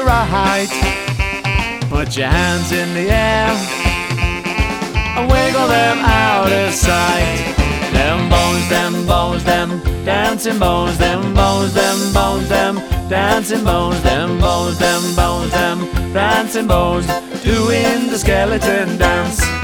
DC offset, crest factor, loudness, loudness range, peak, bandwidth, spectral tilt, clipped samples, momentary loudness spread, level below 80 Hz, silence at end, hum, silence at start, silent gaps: under 0.1%; 14 dB; -15 LUFS; 2 LU; 0 dBFS; over 20 kHz; -4.5 dB/octave; under 0.1%; 5 LU; -22 dBFS; 0 s; none; 0 s; none